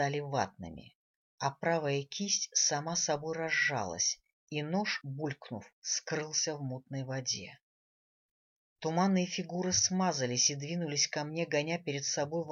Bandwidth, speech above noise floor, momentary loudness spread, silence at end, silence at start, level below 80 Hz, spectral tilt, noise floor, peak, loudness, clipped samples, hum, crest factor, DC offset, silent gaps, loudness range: 7.8 kHz; over 56 dB; 12 LU; 0 s; 0 s; -70 dBFS; -3 dB/octave; under -90 dBFS; -14 dBFS; -32 LUFS; under 0.1%; none; 20 dB; under 0.1%; 0.95-1.38 s, 4.33-4.47 s, 5.73-5.82 s, 7.63-8.76 s; 6 LU